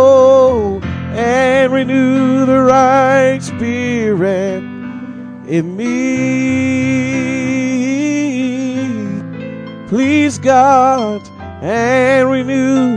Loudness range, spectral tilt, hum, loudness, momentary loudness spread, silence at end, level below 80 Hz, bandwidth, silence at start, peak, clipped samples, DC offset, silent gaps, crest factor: 5 LU; -6 dB/octave; none; -13 LUFS; 15 LU; 0 s; -44 dBFS; 10 kHz; 0 s; 0 dBFS; under 0.1%; under 0.1%; none; 12 dB